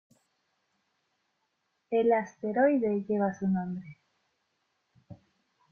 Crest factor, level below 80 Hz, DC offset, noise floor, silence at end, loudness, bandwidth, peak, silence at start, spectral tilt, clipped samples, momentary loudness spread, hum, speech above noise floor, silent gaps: 20 dB; -72 dBFS; under 0.1%; -78 dBFS; 0.55 s; -28 LUFS; 6.6 kHz; -12 dBFS; 1.9 s; -8.5 dB/octave; under 0.1%; 8 LU; none; 51 dB; none